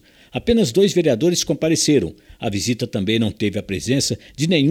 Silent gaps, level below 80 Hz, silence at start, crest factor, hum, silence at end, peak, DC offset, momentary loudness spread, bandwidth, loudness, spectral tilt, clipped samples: none; -44 dBFS; 0.35 s; 16 dB; none; 0 s; -4 dBFS; under 0.1%; 9 LU; 16.5 kHz; -19 LUFS; -4.5 dB/octave; under 0.1%